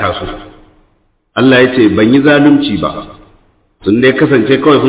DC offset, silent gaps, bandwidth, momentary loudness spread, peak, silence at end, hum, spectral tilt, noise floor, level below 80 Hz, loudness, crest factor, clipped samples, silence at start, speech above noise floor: under 0.1%; none; 4 kHz; 14 LU; 0 dBFS; 0 s; none; -10.5 dB/octave; -55 dBFS; -38 dBFS; -9 LUFS; 10 dB; under 0.1%; 0 s; 47 dB